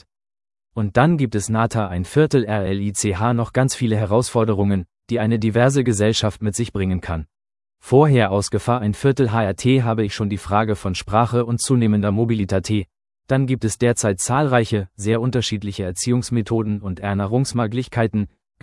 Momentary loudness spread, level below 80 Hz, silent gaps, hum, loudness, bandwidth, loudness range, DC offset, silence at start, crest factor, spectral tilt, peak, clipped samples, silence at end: 7 LU; -48 dBFS; none; none; -20 LUFS; 12 kHz; 2 LU; under 0.1%; 0.75 s; 18 dB; -6 dB/octave; 0 dBFS; under 0.1%; 0.35 s